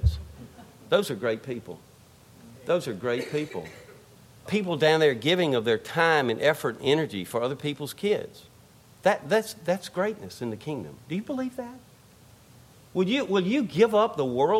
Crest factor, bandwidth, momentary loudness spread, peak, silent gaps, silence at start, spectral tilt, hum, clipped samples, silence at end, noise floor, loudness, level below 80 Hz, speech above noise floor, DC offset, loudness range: 18 dB; 16 kHz; 16 LU; -8 dBFS; none; 0 s; -5.5 dB/octave; none; under 0.1%; 0 s; -54 dBFS; -26 LUFS; -44 dBFS; 28 dB; under 0.1%; 8 LU